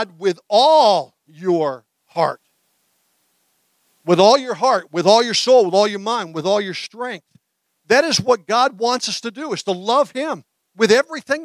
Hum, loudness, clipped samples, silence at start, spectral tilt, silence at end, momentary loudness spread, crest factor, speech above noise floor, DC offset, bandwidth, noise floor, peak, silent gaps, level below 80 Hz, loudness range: none; -17 LUFS; under 0.1%; 0 s; -3.5 dB/octave; 0 s; 14 LU; 18 dB; 48 dB; under 0.1%; 14 kHz; -65 dBFS; -2 dBFS; none; -66 dBFS; 4 LU